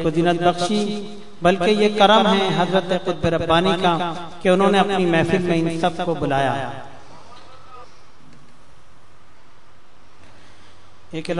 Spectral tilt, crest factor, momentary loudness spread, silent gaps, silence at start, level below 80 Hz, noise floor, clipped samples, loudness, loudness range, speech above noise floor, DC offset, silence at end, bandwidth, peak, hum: -5.5 dB/octave; 20 dB; 12 LU; none; 0 s; -50 dBFS; -52 dBFS; under 0.1%; -19 LUFS; 10 LU; 34 dB; 2%; 0 s; 11 kHz; -2 dBFS; none